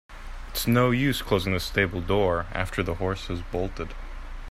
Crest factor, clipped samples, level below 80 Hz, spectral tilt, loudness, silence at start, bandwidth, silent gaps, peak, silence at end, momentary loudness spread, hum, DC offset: 18 dB; under 0.1%; -38 dBFS; -5.5 dB/octave; -26 LUFS; 0.1 s; 16 kHz; none; -8 dBFS; 0 s; 19 LU; none; under 0.1%